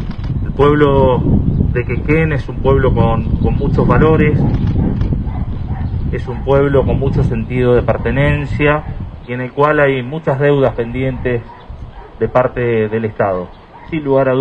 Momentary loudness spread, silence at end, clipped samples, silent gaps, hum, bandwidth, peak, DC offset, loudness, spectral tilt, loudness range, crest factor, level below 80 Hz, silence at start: 11 LU; 0 s; under 0.1%; none; none; 5.6 kHz; 0 dBFS; under 0.1%; -15 LUFS; -9.5 dB/octave; 3 LU; 14 dB; -24 dBFS; 0 s